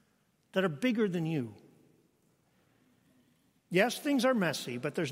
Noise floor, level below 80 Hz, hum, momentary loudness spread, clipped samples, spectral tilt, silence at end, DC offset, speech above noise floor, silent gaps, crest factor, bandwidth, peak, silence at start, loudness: -72 dBFS; -80 dBFS; none; 8 LU; under 0.1%; -5.5 dB/octave; 0 s; under 0.1%; 42 dB; none; 22 dB; 16 kHz; -12 dBFS; 0.55 s; -31 LUFS